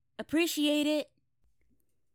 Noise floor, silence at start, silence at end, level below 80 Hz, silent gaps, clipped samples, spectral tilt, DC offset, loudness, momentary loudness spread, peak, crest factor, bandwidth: -76 dBFS; 0.2 s; 1.1 s; -72 dBFS; none; under 0.1%; -2.5 dB/octave; under 0.1%; -30 LUFS; 7 LU; -16 dBFS; 16 dB; 20 kHz